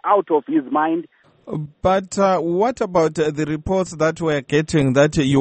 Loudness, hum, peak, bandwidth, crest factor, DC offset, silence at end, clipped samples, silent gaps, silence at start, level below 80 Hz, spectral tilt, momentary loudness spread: -19 LUFS; none; -2 dBFS; 8.8 kHz; 16 dB; under 0.1%; 0 s; under 0.1%; none; 0.05 s; -44 dBFS; -6 dB/octave; 7 LU